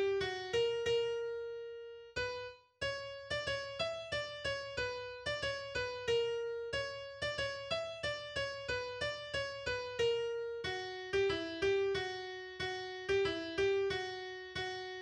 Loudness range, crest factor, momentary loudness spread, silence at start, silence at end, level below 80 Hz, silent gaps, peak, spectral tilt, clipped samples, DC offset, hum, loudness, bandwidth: 3 LU; 14 dB; 8 LU; 0 s; 0 s; -62 dBFS; none; -24 dBFS; -3.5 dB/octave; under 0.1%; under 0.1%; none; -38 LUFS; 10.5 kHz